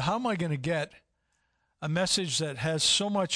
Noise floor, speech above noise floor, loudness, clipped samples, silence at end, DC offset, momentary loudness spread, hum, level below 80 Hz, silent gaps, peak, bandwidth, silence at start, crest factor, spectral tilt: -75 dBFS; 47 dB; -28 LUFS; under 0.1%; 0 s; under 0.1%; 9 LU; none; -62 dBFS; none; -14 dBFS; 11 kHz; 0 s; 16 dB; -3.5 dB/octave